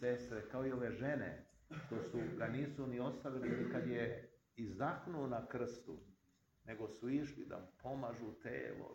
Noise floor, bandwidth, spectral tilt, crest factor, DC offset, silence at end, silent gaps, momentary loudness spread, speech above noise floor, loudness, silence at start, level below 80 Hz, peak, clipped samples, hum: -77 dBFS; 16.5 kHz; -7.5 dB/octave; 18 dB; under 0.1%; 0 s; none; 12 LU; 33 dB; -45 LUFS; 0 s; -70 dBFS; -26 dBFS; under 0.1%; none